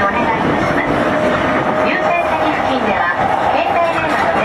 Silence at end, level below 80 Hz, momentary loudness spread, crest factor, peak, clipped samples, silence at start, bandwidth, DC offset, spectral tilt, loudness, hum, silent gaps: 0 s; -40 dBFS; 1 LU; 12 dB; -4 dBFS; under 0.1%; 0 s; 13.5 kHz; under 0.1%; -6 dB/octave; -15 LUFS; none; none